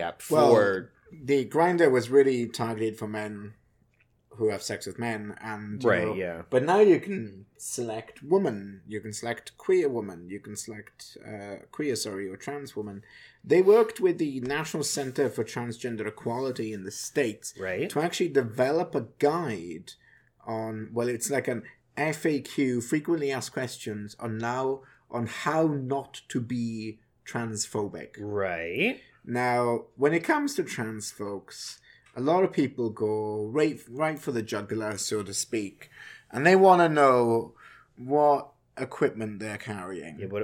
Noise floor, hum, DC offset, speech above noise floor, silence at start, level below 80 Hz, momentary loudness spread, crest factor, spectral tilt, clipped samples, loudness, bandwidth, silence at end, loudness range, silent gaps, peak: -66 dBFS; none; under 0.1%; 39 dB; 0 s; -70 dBFS; 18 LU; 22 dB; -5 dB/octave; under 0.1%; -27 LUFS; 17.5 kHz; 0 s; 8 LU; none; -6 dBFS